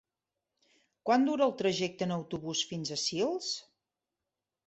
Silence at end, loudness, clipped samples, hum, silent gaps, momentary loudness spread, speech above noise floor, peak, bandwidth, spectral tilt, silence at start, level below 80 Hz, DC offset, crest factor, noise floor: 1.05 s; -32 LUFS; under 0.1%; none; none; 9 LU; 58 dB; -14 dBFS; 8.4 kHz; -4 dB/octave; 1.05 s; -72 dBFS; under 0.1%; 20 dB; -89 dBFS